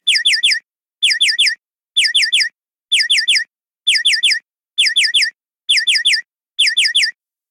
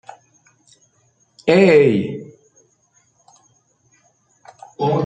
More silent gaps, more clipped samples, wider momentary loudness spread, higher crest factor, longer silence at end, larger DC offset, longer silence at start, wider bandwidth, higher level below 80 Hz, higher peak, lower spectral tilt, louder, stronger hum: neither; neither; second, 8 LU vs 16 LU; second, 14 dB vs 20 dB; first, 0.4 s vs 0 s; neither; second, 0.05 s vs 1.45 s; first, 17 kHz vs 9.2 kHz; second, under -90 dBFS vs -62 dBFS; about the same, -4 dBFS vs -2 dBFS; second, 8 dB/octave vs -7 dB/octave; about the same, -13 LUFS vs -15 LUFS; neither